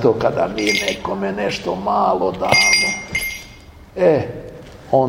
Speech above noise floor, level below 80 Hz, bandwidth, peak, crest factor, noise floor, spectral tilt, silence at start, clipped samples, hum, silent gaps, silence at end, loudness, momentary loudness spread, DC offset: 23 dB; -44 dBFS; 16.5 kHz; 0 dBFS; 18 dB; -41 dBFS; -3 dB/octave; 0 s; under 0.1%; none; none; 0 s; -17 LUFS; 15 LU; under 0.1%